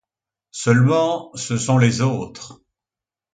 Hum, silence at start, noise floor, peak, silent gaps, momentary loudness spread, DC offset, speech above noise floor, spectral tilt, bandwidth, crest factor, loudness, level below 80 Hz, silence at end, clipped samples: none; 0.55 s; -90 dBFS; -2 dBFS; none; 20 LU; under 0.1%; 71 dB; -6 dB/octave; 9.4 kHz; 18 dB; -19 LUFS; -56 dBFS; 0.8 s; under 0.1%